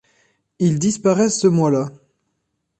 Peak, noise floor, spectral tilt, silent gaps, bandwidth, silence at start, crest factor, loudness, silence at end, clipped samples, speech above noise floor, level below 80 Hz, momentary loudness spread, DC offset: -4 dBFS; -73 dBFS; -6 dB/octave; none; 9 kHz; 0.6 s; 16 dB; -18 LUFS; 0.9 s; under 0.1%; 56 dB; -58 dBFS; 6 LU; under 0.1%